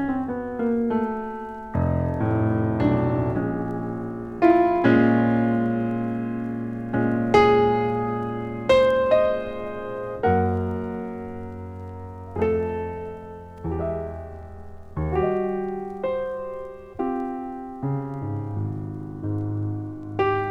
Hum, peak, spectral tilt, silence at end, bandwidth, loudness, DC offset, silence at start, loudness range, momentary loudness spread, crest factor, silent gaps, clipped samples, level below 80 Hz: none; -4 dBFS; -8.5 dB/octave; 0 s; 8.4 kHz; -24 LUFS; under 0.1%; 0 s; 9 LU; 16 LU; 20 dB; none; under 0.1%; -44 dBFS